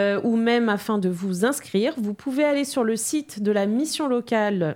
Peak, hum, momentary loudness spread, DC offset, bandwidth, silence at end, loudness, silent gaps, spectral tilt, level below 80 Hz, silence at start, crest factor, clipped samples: -8 dBFS; none; 5 LU; under 0.1%; 17 kHz; 0 s; -23 LUFS; none; -5 dB/octave; -68 dBFS; 0 s; 16 dB; under 0.1%